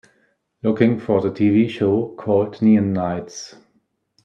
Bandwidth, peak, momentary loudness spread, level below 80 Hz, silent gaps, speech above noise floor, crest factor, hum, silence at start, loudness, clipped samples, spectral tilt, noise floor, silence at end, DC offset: 7.4 kHz; -2 dBFS; 12 LU; -60 dBFS; none; 48 dB; 18 dB; none; 0.65 s; -19 LUFS; under 0.1%; -7.5 dB/octave; -66 dBFS; 0.75 s; under 0.1%